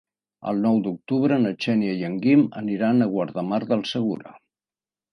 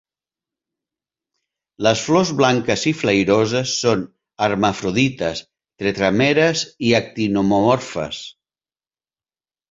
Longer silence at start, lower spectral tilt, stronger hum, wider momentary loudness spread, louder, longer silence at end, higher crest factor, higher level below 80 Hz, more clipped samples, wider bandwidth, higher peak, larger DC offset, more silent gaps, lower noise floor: second, 0.45 s vs 1.8 s; first, -7.5 dB/octave vs -4.5 dB/octave; neither; second, 7 LU vs 10 LU; second, -23 LUFS vs -18 LUFS; second, 0.75 s vs 1.4 s; about the same, 16 dB vs 18 dB; second, -68 dBFS vs -52 dBFS; neither; first, 10.5 kHz vs 7.8 kHz; second, -8 dBFS vs -2 dBFS; neither; neither; about the same, under -90 dBFS vs under -90 dBFS